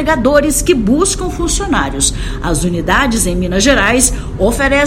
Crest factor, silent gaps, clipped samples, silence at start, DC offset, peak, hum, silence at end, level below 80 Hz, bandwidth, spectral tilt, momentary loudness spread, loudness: 12 dB; none; 0.2%; 0 s; under 0.1%; 0 dBFS; none; 0 s; -22 dBFS; over 20 kHz; -3.5 dB/octave; 6 LU; -13 LUFS